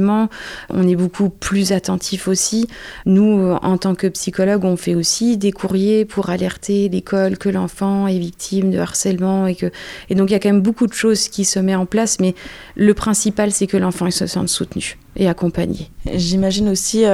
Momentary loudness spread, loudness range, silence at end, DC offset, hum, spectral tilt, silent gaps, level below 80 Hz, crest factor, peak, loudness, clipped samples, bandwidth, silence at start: 7 LU; 2 LU; 0 s; under 0.1%; none; -5 dB/octave; none; -42 dBFS; 16 dB; -2 dBFS; -17 LUFS; under 0.1%; 15 kHz; 0 s